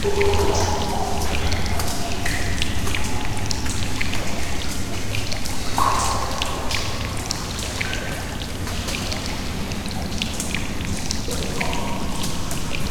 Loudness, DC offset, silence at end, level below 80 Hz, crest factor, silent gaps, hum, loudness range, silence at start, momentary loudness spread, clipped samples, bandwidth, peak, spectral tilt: -25 LUFS; 0.2%; 0 s; -30 dBFS; 20 dB; none; none; 2 LU; 0 s; 7 LU; under 0.1%; 18 kHz; 0 dBFS; -3.5 dB/octave